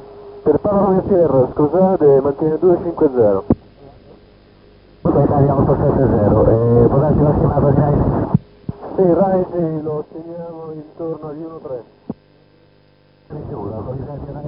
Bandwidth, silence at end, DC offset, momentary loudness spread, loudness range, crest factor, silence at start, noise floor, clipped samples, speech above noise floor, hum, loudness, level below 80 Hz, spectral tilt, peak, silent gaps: 5.2 kHz; 0 s; under 0.1%; 18 LU; 16 LU; 16 dB; 0 s; -52 dBFS; under 0.1%; 37 dB; none; -15 LUFS; -34 dBFS; -15 dB/octave; 0 dBFS; none